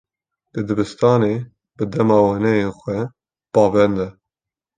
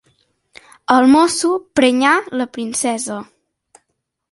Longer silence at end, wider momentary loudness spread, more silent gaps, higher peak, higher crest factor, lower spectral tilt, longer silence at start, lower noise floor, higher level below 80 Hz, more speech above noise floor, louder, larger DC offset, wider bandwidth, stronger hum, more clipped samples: second, 0.65 s vs 1.05 s; about the same, 14 LU vs 13 LU; neither; about the same, -2 dBFS vs 0 dBFS; about the same, 18 dB vs 16 dB; first, -8 dB/octave vs -2.5 dB/octave; second, 0.55 s vs 0.9 s; first, -88 dBFS vs -73 dBFS; first, -50 dBFS vs -60 dBFS; first, 70 dB vs 58 dB; second, -18 LUFS vs -15 LUFS; neither; second, 9.4 kHz vs 11.5 kHz; neither; neither